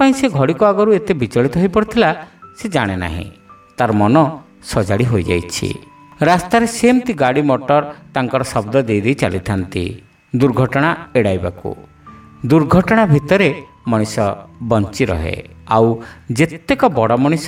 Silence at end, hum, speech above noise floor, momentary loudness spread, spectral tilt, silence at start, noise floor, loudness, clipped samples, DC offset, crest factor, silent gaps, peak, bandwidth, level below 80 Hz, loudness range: 0 s; none; 25 dB; 12 LU; -6.5 dB/octave; 0 s; -40 dBFS; -16 LUFS; under 0.1%; under 0.1%; 16 dB; none; 0 dBFS; 16 kHz; -40 dBFS; 3 LU